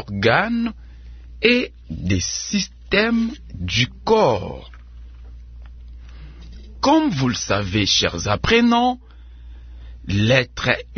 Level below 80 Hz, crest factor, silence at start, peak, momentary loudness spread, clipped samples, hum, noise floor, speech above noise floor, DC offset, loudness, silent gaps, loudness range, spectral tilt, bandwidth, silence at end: -38 dBFS; 20 dB; 0 s; 0 dBFS; 14 LU; under 0.1%; none; -39 dBFS; 20 dB; under 0.1%; -19 LUFS; none; 5 LU; -4.5 dB/octave; 6.6 kHz; 0 s